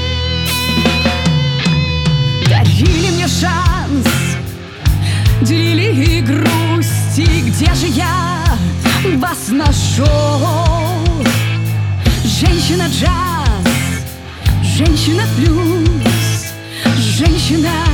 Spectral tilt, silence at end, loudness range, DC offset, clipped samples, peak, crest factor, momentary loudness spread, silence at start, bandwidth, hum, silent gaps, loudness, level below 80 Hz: -5 dB/octave; 0 s; 1 LU; under 0.1%; under 0.1%; 0 dBFS; 12 dB; 4 LU; 0 s; 18.5 kHz; none; none; -13 LUFS; -22 dBFS